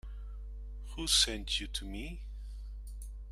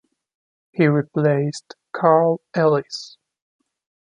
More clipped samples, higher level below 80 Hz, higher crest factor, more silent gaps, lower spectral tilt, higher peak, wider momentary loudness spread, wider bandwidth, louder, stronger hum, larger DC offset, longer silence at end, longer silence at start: neither; first, -42 dBFS vs -68 dBFS; about the same, 24 dB vs 20 dB; neither; second, -1.5 dB/octave vs -7 dB/octave; second, -14 dBFS vs -2 dBFS; first, 21 LU vs 17 LU; first, 15 kHz vs 10.5 kHz; second, -31 LUFS vs -19 LUFS; first, 50 Hz at -40 dBFS vs none; neither; second, 0 s vs 1 s; second, 0.05 s vs 0.75 s